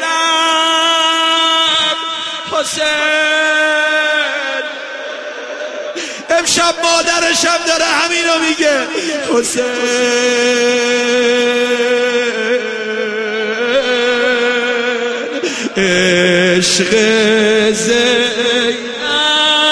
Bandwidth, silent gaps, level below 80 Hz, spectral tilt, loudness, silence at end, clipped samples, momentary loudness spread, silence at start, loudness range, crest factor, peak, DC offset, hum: 11 kHz; none; -52 dBFS; -2 dB/octave; -12 LUFS; 0 s; under 0.1%; 8 LU; 0 s; 4 LU; 14 dB; 0 dBFS; under 0.1%; none